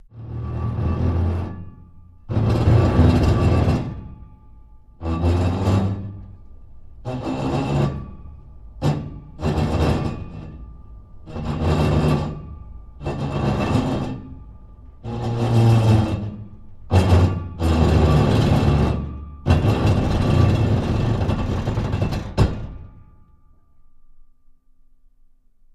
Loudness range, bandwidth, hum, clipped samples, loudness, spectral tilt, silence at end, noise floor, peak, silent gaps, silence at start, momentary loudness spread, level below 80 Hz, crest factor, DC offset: 8 LU; 12 kHz; none; under 0.1%; -20 LUFS; -8 dB/octave; 1.5 s; -52 dBFS; -2 dBFS; none; 0.15 s; 20 LU; -30 dBFS; 18 dB; under 0.1%